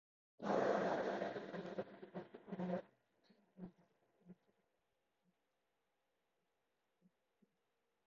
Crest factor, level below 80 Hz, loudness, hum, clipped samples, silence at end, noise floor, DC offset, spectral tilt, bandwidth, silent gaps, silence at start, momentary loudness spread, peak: 24 dB; -88 dBFS; -43 LUFS; none; under 0.1%; 3.75 s; -87 dBFS; under 0.1%; -5 dB/octave; 7.2 kHz; none; 0.4 s; 20 LU; -24 dBFS